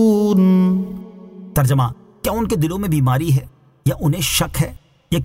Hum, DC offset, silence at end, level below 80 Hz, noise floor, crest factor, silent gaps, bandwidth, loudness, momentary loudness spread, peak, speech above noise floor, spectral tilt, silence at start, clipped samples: none; under 0.1%; 0 s; -38 dBFS; -37 dBFS; 12 dB; none; 16.5 kHz; -18 LUFS; 11 LU; -4 dBFS; 21 dB; -6 dB/octave; 0 s; under 0.1%